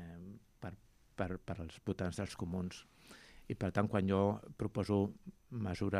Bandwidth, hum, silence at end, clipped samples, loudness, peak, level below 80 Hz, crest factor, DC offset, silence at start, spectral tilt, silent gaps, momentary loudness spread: 13.5 kHz; none; 0 s; under 0.1%; -39 LUFS; -18 dBFS; -62 dBFS; 20 dB; under 0.1%; 0 s; -7.5 dB/octave; none; 21 LU